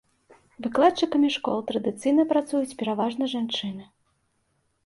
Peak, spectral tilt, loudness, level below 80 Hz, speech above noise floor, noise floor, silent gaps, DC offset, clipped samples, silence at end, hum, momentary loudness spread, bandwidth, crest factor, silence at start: -6 dBFS; -5 dB/octave; -25 LUFS; -68 dBFS; 47 dB; -71 dBFS; none; under 0.1%; under 0.1%; 1 s; none; 8 LU; 11.5 kHz; 18 dB; 0.6 s